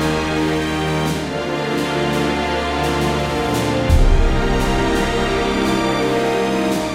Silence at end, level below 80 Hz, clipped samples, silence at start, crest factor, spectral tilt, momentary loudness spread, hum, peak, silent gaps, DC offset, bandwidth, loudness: 0 s; -22 dBFS; under 0.1%; 0 s; 14 dB; -5.5 dB/octave; 3 LU; none; -2 dBFS; none; under 0.1%; 16 kHz; -18 LUFS